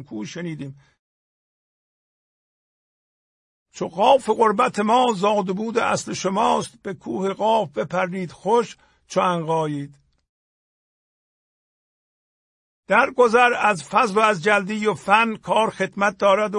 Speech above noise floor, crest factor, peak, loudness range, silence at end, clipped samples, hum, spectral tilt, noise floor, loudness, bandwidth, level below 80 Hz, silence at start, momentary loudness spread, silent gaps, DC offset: over 70 dB; 20 dB; -2 dBFS; 10 LU; 0 s; under 0.1%; none; -4.5 dB/octave; under -90 dBFS; -20 LUFS; 11.5 kHz; -64 dBFS; 0 s; 14 LU; 0.99-3.66 s, 10.29-12.83 s; under 0.1%